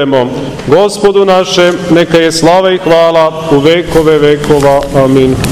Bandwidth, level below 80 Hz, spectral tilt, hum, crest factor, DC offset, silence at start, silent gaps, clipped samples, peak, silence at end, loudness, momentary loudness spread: 16 kHz; -32 dBFS; -5.5 dB/octave; none; 8 dB; under 0.1%; 0 s; none; 6%; 0 dBFS; 0 s; -7 LUFS; 3 LU